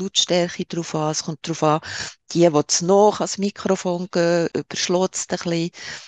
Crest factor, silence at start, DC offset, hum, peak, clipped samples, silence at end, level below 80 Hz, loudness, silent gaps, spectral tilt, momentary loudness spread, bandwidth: 18 dB; 0 s; under 0.1%; none; -2 dBFS; under 0.1%; 0 s; -62 dBFS; -21 LUFS; none; -4 dB/octave; 10 LU; 9.6 kHz